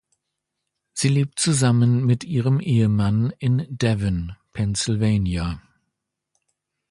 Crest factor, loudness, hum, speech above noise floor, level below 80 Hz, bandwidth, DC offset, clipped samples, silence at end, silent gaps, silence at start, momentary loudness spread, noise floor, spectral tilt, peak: 16 dB; -21 LUFS; none; 60 dB; -42 dBFS; 11.5 kHz; under 0.1%; under 0.1%; 1.3 s; none; 0.95 s; 10 LU; -80 dBFS; -5.5 dB/octave; -4 dBFS